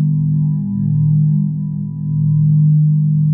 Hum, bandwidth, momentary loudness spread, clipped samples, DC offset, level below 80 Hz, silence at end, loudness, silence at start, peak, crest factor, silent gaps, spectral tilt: none; 1.1 kHz; 8 LU; under 0.1%; under 0.1%; -50 dBFS; 0 s; -15 LUFS; 0 s; -6 dBFS; 8 dB; none; -16.5 dB/octave